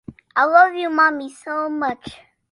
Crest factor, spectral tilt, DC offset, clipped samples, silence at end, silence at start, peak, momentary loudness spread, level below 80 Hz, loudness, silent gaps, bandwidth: 18 dB; -4.5 dB/octave; under 0.1%; under 0.1%; 0.35 s; 0.1 s; -2 dBFS; 16 LU; -60 dBFS; -18 LUFS; none; 11 kHz